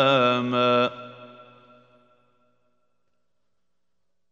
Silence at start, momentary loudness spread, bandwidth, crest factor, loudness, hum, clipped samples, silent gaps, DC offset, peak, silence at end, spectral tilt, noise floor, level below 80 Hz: 0 s; 23 LU; 7.6 kHz; 20 dB; -21 LUFS; none; under 0.1%; none; under 0.1%; -6 dBFS; 3.05 s; -6 dB/octave; -82 dBFS; -74 dBFS